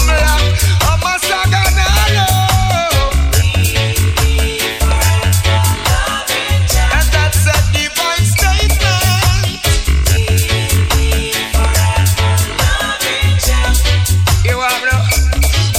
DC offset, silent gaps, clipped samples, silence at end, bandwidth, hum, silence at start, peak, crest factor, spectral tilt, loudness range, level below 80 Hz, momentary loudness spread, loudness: under 0.1%; none; under 0.1%; 0 s; 17 kHz; none; 0 s; 0 dBFS; 12 dB; -3.5 dB/octave; 1 LU; -16 dBFS; 3 LU; -12 LUFS